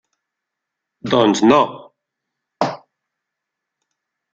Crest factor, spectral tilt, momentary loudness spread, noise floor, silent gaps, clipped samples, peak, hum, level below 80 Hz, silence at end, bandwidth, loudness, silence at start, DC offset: 20 dB; -5 dB/octave; 16 LU; -81 dBFS; none; under 0.1%; -2 dBFS; none; -60 dBFS; 1.55 s; 9 kHz; -16 LUFS; 1.05 s; under 0.1%